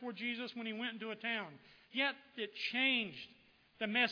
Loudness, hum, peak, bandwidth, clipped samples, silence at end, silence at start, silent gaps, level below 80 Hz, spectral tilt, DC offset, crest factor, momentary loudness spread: -38 LUFS; none; -20 dBFS; 5.4 kHz; under 0.1%; 0 s; 0 s; none; -86 dBFS; -4.5 dB/octave; under 0.1%; 20 dB; 12 LU